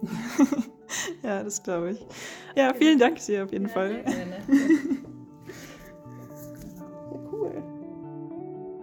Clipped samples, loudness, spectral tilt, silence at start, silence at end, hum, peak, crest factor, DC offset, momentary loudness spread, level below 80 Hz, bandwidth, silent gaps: under 0.1%; -26 LUFS; -4.5 dB/octave; 0 s; 0 s; none; -8 dBFS; 20 dB; under 0.1%; 22 LU; -62 dBFS; 19.5 kHz; none